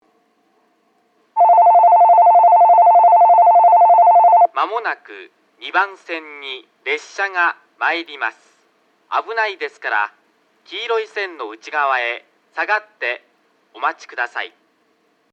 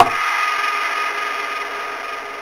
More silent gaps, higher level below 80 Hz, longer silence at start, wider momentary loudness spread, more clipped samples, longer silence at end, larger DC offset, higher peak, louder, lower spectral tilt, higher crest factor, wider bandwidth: neither; second, under -90 dBFS vs -56 dBFS; first, 1.35 s vs 0 s; first, 18 LU vs 8 LU; neither; first, 0.85 s vs 0 s; neither; second, -4 dBFS vs 0 dBFS; first, -14 LUFS vs -20 LUFS; about the same, -0.5 dB/octave vs -1.5 dB/octave; second, 12 dB vs 20 dB; second, 7 kHz vs 16 kHz